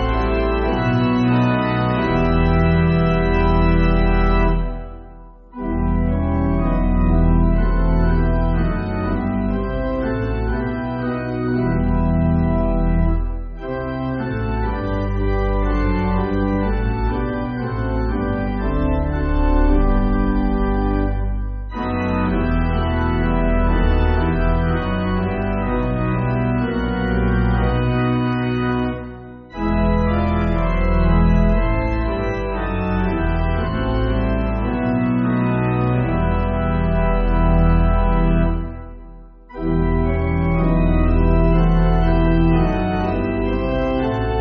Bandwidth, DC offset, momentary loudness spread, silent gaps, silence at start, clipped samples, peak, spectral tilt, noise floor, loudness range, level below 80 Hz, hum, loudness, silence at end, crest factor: 5.2 kHz; under 0.1%; 7 LU; none; 0 s; under 0.1%; -4 dBFS; -7 dB/octave; -39 dBFS; 4 LU; -22 dBFS; none; -19 LUFS; 0 s; 14 dB